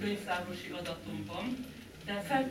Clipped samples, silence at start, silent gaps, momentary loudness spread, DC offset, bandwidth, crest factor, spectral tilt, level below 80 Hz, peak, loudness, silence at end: under 0.1%; 0 s; none; 9 LU; under 0.1%; 16.5 kHz; 18 dB; -5 dB/octave; -62 dBFS; -18 dBFS; -38 LUFS; 0 s